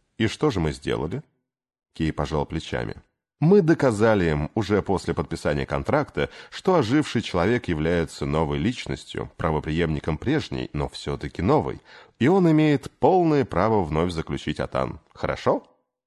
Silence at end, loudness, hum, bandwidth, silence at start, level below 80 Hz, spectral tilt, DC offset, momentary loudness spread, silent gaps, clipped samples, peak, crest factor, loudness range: 0.45 s; -24 LUFS; none; 12 kHz; 0.2 s; -40 dBFS; -7 dB/octave; under 0.1%; 11 LU; none; under 0.1%; -4 dBFS; 20 dB; 5 LU